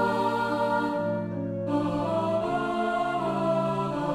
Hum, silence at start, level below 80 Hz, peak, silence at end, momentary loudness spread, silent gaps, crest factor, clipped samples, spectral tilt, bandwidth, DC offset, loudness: none; 0 s; -58 dBFS; -14 dBFS; 0 s; 3 LU; none; 12 dB; under 0.1%; -7 dB/octave; 14.5 kHz; under 0.1%; -27 LUFS